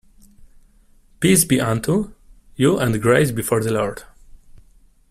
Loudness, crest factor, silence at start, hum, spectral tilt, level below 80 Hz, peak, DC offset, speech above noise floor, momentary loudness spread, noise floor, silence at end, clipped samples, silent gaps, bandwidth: -18 LUFS; 20 dB; 1.2 s; none; -5 dB/octave; -46 dBFS; -2 dBFS; under 0.1%; 35 dB; 9 LU; -52 dBFS; 0.8 s; under 0.1%; none; 16 kHz